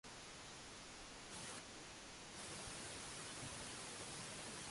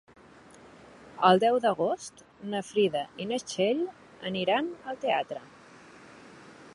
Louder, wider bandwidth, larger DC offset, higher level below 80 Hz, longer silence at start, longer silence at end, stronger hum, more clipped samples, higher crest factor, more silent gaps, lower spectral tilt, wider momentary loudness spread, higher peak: second, -51 LUFS vs -28 LUFS; about the same, 11.5 kHz vs 11.5 kHz; neither; about the same, -70 dBFS vs -72 dBFS; second, 0.05 s vs 0.65 s; about the same, 0 s vs 0.05 s; neither; neither; second, 16 dB vs 22 dB; neither; second, -2 dB/octave vs -4.5 dB/octave; second, 5 LU vs 16 LU; second, -38 dBFS vs -8 dBFS